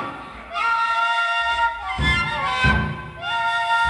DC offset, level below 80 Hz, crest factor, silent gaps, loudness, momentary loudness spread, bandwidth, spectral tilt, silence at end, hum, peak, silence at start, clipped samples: under 0.1%; -34 dBFS; 16 dB; none; -21 LUFS; 10 LU; 11 kHz; -4.5 dB/octave; 0 s; none; -6 dBFS; 0 s; under 0.1%